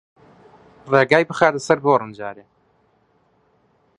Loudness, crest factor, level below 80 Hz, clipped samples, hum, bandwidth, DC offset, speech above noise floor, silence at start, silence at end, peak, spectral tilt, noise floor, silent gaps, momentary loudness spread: -17 LUFS; 22 dB; -64 dBFS; under 0.1%; none; 11.5 kHz; under 0.1%; 43 dB; 0.85 s; 1.65 s; 0 dBFS; -5.5 dB/octave; -61 dBFS; none; 17 LU